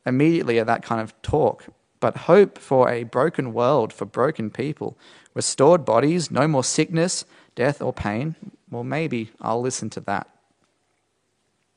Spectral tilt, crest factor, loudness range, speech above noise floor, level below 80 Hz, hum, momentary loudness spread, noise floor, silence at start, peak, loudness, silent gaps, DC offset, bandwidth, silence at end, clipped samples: -5 dB/octave; 20 dB; 7 LU; 49 dB; -54 dBFS; none; 12 LU; -71 dBFS; 0.05 s; -2 dBFS; -22 LUFS; none; under 0.1%; 11 kHz; 1.55 s; under 0.1%